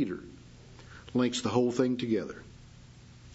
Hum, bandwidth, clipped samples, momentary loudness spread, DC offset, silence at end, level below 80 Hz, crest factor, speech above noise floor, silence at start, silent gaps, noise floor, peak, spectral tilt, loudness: none; 8 kHz; under 0.1%; 24 LU; under 0.1%; 0.05 s; -60 dBFS; 20 dB; 23 dB; 0 s; none; -52 dBFS; -12 dBFS; -5.5 dB/octave; -30 LUFS